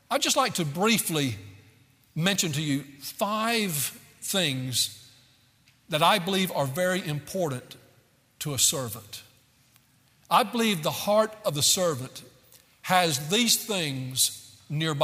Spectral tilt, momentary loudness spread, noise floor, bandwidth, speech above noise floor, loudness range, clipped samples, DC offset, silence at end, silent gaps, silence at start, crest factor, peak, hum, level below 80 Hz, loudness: -3 dB/octave; 15 LU; -62 dBFS; 16 kHz; 36 dB; 4 LU; under 0.1%; under 0.1%; 0 s; none; 0.1 s; 22 dB; -6 dBFS; none; -68 dBFS; -25 LUFS